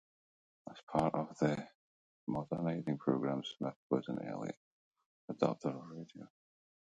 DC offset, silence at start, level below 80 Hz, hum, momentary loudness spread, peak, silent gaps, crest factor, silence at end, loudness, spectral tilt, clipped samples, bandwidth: under 0.1%; 0.65 s; -70 dBFS; none; 19 LU; -16 dBFS; 0.83-0.87 s, 1.75-2.27 s, 3.76-3.90 s, 4.57-4.91 s, 5.06-5.28 s; 24 dB; 0.6 s; -38 LUFS; -7.5 dB/octave; under 0.1%; 9 kHz